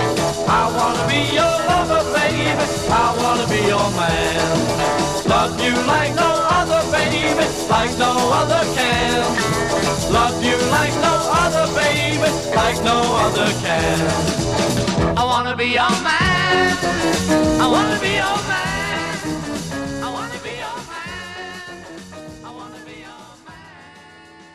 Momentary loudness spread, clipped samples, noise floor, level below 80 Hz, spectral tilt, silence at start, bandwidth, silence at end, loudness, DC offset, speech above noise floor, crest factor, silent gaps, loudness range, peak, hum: 13 LU; under 0.1%; -43 dBFS; -38 dBFS; -4 dB/octave; 0 s; 15.5 kHz; 0.1 s; -17 LUFS; 0.3%; 26 dB; 14 dB; none; 11 LU; -4 dBFS; none